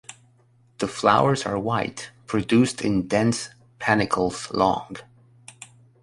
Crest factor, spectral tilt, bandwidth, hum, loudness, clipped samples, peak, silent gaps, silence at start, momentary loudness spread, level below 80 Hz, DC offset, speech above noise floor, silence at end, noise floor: 22 dB; -5 dB/octave; 11.5 kHz; none; -23 LUFS; under 0.1%; -2 dBFS; none; 0.1 s; 19 LU; -54 dBFS; under 0.1%; 36 dB; 0.4 s; -59 dBFS